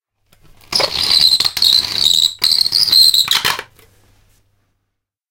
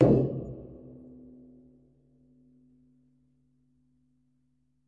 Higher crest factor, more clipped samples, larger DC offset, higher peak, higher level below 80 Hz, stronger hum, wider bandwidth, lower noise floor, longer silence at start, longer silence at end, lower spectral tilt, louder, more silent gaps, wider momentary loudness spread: second, 16 dB vs 26 dB; neither; neither; first, 0 dBFS vs -6 dBFS; first, -48 dBFS vs -54 dBFS; neither; first, 17.5 kHz vs 4.9 kHz; about the same, -74 dBFS vs -73 dBFS; first, 0.7 s vs 0 s; second, 1.7 s vs 3.95 s; second, 0.5 dB/octave vs -11.5 dB/octave; first, -10 LUFS vs -29 LUFS; neither; second, 9 LU vs 28 LU